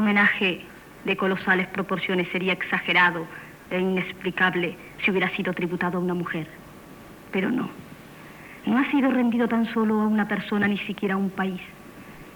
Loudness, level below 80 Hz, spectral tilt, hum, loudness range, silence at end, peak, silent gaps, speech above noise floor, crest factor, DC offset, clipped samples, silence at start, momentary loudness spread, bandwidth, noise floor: -24 LUFS; -60 dBFS; -6.5 dB/octave; none; 4 LU; 0 s; -8 dBFS; none; 21 dB; 18 dB; under 0.1%; under 0.1%; 0 s; 22 LU; over 20 kHz; -45 dBFS